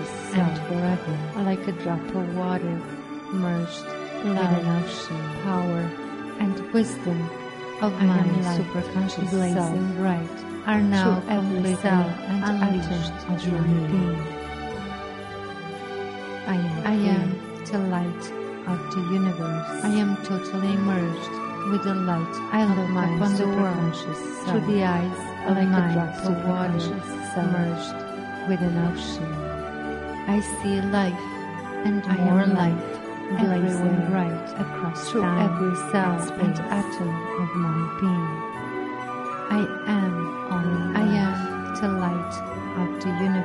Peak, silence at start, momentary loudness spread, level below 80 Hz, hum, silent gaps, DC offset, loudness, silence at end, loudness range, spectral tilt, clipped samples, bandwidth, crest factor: -8 dBFS; 0 s; 10 LU; -52 dBFS; none; none; under 0.1%; -25 LUFS; 0 s; 4 LU; -7 dB/octave; under 0.1%; 11.5 kHz; 18 dB